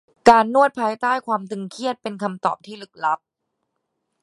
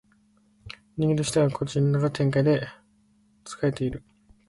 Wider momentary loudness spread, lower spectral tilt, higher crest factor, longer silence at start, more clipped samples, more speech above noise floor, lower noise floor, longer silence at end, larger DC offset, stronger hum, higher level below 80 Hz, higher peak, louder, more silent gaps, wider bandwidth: second, 14 LU vs 19 LU; second, -5 dB/octave vs -6.5 dB/octave; first, 22 dB vs 16 dB; second, 0.25 s vs 0.65 s; neither; first, 56 dB vs 39 dB; first, -77 dBFS vs -63 dBFS; first, 1.05 s vs 0.5 s; neither; neither; second, -62 dBFS vs -54 dBFS; first, 0 dBFS vs -10 dBFS; first, -20 LUFS vs -25 LUFS; neither; about the same, 11.5 kHz vs 11.5 kHz